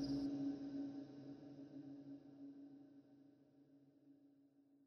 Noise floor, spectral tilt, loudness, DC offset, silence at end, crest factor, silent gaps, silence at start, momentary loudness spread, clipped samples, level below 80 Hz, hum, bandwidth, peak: -72 dBFS; -7.5 dB/octave; -50 LUFS; under 0.1%; 0 s; 16 dB; none; 0 s; 25 LU; under 0.1%; -78 dBFS; none; 6.6 kHz; -34 dBFS